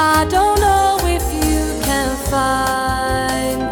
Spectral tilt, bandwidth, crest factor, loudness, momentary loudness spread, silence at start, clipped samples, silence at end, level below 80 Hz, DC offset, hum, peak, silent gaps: -4 dB/octave; 19.5 kHz; 16 dB; -16 LUFS; 5 LU; 0 s; under 0.1%; 0 s; -26 dBFS; under 0.1%; none; 0 dBFS; none